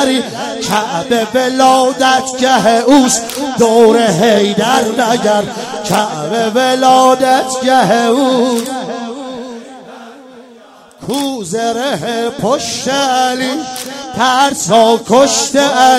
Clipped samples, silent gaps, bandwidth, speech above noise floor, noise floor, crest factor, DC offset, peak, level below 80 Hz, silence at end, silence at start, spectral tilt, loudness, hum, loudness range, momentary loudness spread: 0.3%; none; 16.5 kHz; 28 dB; -39 dBFS; 12 dB; under 0.1%; 0 dBFS; -52 dBFS; 0 s; 0 s; -3.5 dB/octave; -12 LUFS; none; 9 LU; 12 LU